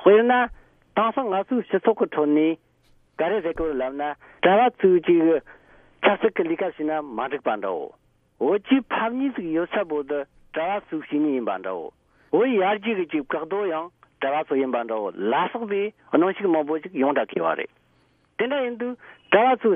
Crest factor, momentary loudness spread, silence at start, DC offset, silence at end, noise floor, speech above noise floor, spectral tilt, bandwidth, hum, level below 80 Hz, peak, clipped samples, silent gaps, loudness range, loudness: 20 dB; 11 LU; 0 s; under 0.1%; 0 s; -63 dBFS; 40 dB; -9 dB/octave; 3.7 kHz; none; -58 dBFS; -4 dBFS; under 0.1%; none; 4 LU; -23 LUFS